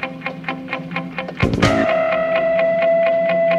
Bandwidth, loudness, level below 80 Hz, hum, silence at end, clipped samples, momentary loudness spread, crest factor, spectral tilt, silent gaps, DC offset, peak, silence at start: 10.5 kHz; -18 LUFS; -40 dBFS; none; 0 s; under 0.1%; 11 LU; 18 dB; -6 dB/octave; none; under 0.1%; 0 dBFS; 0 s